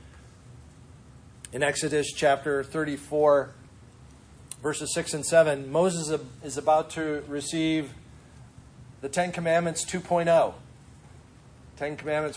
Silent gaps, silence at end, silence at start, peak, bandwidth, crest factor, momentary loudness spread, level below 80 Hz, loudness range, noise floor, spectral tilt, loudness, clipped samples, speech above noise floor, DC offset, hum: none; 0 s; 0.05 s; -8 dBFS; 10.5 kHz; 20 dB; 13 LU; -56 dBFS; 3 LU; -51 dBFS; -4 dB/octave; -26 LUFS; under 0.1%; 25 dB; under 0.1%; none